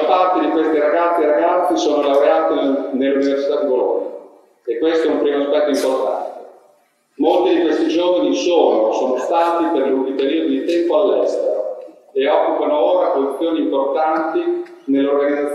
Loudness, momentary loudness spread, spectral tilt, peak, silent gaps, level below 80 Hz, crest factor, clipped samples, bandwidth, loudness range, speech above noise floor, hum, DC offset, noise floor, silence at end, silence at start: -17 LUFS; 7 LU; -4 dB/octave; 0 dBFS; none; -70 dBFS; 16 dB; under 0.1%; 12.5 kHz; 3 LU; 41 dB; none; under 0.1%; -56 dBFS; 0 s; 0 s